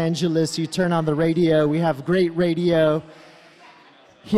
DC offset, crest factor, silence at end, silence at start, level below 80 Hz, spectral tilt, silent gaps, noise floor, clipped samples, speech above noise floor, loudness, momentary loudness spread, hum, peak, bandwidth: under 0.1%; 14 dB; 0 s; 0 s; -56 dBFS; -6.5 dB/octave; none; -51 dBFS; under 0.1%; 31 dB; -20 LUFS; 4 LU; none; -6 dBFS; 13 kHz